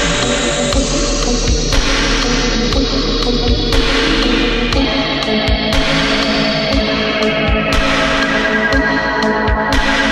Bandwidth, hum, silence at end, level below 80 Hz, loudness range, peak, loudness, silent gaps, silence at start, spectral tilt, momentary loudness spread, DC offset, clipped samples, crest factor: 14 kHz; none; 0 s; -20 dBFS; 1 LU; 0 dBFS; -14 LUFS; none; 0 s; -3.5 dB/octave; 2 LU; under 0.1%; under 0.1%; 14 dB